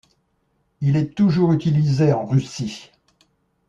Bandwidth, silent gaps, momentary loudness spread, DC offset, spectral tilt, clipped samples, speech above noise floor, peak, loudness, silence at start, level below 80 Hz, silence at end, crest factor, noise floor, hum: 7.6 kHz; none; 12 LU; under 0.1%; -8 dB/octave; under 0.1%; 49 dB; -6 dBFS; -20 LUFS; 0.8 s; -54 dBFS; 0.85 s; 16 dB; -67 dBFS; none